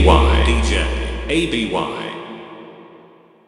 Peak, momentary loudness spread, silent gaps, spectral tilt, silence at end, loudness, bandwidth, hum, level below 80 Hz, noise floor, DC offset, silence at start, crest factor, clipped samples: 0 dBFS; 22 LU; none; -5.5 dB/octave; 0.65 s; -18 LUFS; 11 kHz; none; -22 dBFS; -47 dBFS; under 0.1%; 0 s; 18 dB; under 0.1%